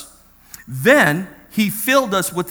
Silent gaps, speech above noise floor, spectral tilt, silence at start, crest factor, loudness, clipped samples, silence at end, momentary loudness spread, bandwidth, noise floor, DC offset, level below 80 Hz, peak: none; 30 dB; -4 dB/octave; 0 s; 18 dB; -16 LUFS; under 0.1%; 0 s; 13 LU; over 20 kHz; -47 dBFS; under 0.1%; -54 dBFS; 0 dBFS